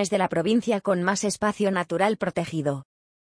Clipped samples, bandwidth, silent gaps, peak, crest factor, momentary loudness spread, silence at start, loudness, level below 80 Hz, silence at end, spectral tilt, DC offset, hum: under 0.1%; 10.5 kHz; none; -8 dBFS; 16 dB; 5 LU; 0 s; -25 LUFS; -62 dBFS; 0.5 s; -5 dB/octave; under 0.1%; none